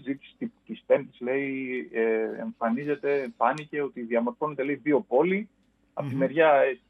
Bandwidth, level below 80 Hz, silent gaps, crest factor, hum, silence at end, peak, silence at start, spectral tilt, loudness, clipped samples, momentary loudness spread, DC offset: 9.4 kHz; -74 dBFS; none; 18 dB; none; 0.15 s; -8 dBFS; 0.05 s; -8 dB/octave; -27 LUFS; under 0.1%; 14 LU; under 0.1%